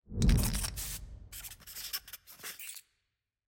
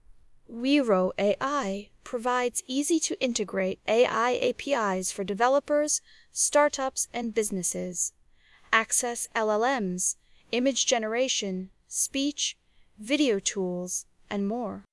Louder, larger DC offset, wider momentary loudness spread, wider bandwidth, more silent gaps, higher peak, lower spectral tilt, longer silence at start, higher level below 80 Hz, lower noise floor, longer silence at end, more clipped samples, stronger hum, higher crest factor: second, -36 LUFS vs -27 LUFS; neither; first, 16 LU vs 9 LU; first, 17 kHz vs 12 kHz; neither; second, -16 dBFS vs -6 dBFS; first, -4 dB/octave vs -2.5 dB/octave; about the same, 0.1 s vs 0.1 s; first, -38 dBFS vs -62 dBFS; first, -85 dBFS vs -59 dBFS; first, 0.65 s vs 0.1 s; neither; neither; about the same, 20 dB vs 22 dB